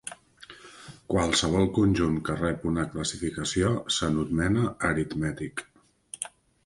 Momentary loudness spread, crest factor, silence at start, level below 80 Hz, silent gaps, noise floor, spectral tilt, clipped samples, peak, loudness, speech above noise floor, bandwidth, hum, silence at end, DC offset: 21 LU; 18 dB; 0.05 s; -44 dBFS; none; -51 dBFS; -5 dB/octave; under 0.1%; -10 dBFS; -27 LUFS; 24 dB; 11.5 kHz; none; 0.35 s; under 0.1%